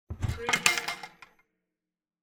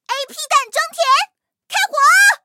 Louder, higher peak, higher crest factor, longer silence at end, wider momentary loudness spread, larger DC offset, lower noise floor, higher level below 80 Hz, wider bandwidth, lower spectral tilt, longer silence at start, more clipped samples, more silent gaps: second, -27 LUFS vs -15 LUFS; about the same, 0 dBFS vs 0 dBFS; first, 32 dB vs 16 dB; first, 1.15 s vs 0.1 s; first, 16 LU vs 13 LU; neither; first, under -90 dBFS vs -38 dBFS; first, -48 dBFS vs -90 dBFS; first, over 20 kHz vs 16.5 kHz; first, -2 dB/octave vs 4.5 dB/octave; about the same, 0.1 s vs 0.1 s; neither; neither